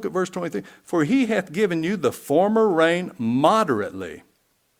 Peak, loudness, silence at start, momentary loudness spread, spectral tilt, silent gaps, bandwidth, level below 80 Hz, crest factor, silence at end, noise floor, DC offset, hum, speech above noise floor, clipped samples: -2 dBFS; -21 LUFS; 0 s; 12 LU; -6 dB/octave; none; 18.5 kHz; -64 dBFS; 20 dB; 0.6 s; -66 dBFS; under 0.1%; none; 45 dB; under 0.1%